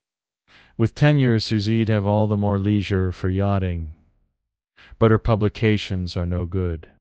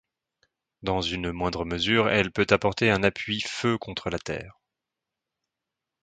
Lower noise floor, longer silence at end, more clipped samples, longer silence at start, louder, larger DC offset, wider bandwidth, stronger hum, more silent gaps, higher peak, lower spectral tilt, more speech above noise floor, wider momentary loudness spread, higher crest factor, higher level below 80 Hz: second, -77 dBFS vs -87 dBFS; second, 0.2 s vs 1.5 s; neither; about the same, 0.8 s vs 0.8 s; first, -21 LUFS vs -26 LUFS; neither; second, 8 kHz vs 9.4 kHz; neither; neither; about the same, -2 dBFS vs -4 dBFS; first, -8 dB/octave vs -5 dB/octave; second, 57 dB vs 61 dB; about the same, 9 LU vs 10 LU; second, 18 dB vs 24 dB; first, -40 dBFS vs -48 dBFS